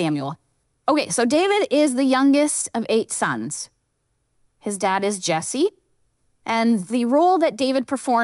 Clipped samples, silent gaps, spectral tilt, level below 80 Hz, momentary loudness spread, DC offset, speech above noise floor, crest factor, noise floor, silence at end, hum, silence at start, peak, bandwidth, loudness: under 0.1%; none; -4 dB/octave; -70 dBFS; 12 LU; under 0.1%; 51 dB; 16 dB; -71 dBFS; 0 s; none; 0 s; -6 dBFS; 12 kHz; -20 LUFS